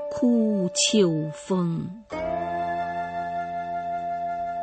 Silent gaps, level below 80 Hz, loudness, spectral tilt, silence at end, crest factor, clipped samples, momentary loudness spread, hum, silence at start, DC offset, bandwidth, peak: none; -58 dBFS; -26 LUFS; -4.5 dB/octave; 0 s; 16 dB; under 0.1%; 9 LU; none; 0 s; under 0.1%; 8.8 kHz; -10 dBFS